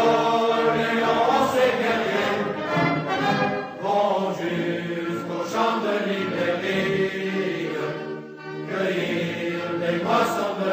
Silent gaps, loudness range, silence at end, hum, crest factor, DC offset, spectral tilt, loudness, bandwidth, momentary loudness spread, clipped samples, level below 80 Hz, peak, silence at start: none; 4 LU; 0 s; none; 16 dB; under 0.1%; -5.5 dB/octave; -23 LUFS; 15.5 kHz; 8 LU; under 0.1%; -64 dBFS; -6 dBFS; 0 s